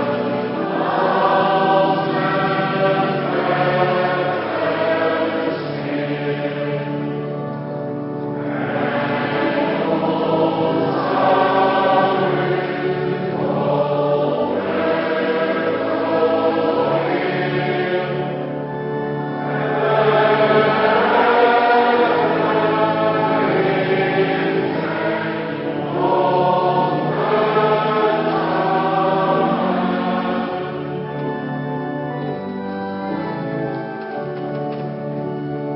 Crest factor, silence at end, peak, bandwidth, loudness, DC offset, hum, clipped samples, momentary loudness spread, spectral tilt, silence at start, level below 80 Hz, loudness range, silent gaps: 18 dB; 0 s; -2 dBFS; 5.8 kHz; -19 LUFS; under 0.1%; none; under 0.1%; 10 LU; -11.5 dB/octave; 0 s; -58 dBFS; 8 LU; none